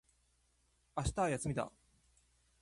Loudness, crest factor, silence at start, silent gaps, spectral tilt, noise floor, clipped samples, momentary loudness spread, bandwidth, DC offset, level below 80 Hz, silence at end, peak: -39 LUFS; 20 dB; 0.95 s; none; -5.5 dB/octave; -75 dBFS; under 0.1%; 10 LU; 11.5 kHz; under 0.1%; -54 dBFS; 0.9 s; -22 dBFS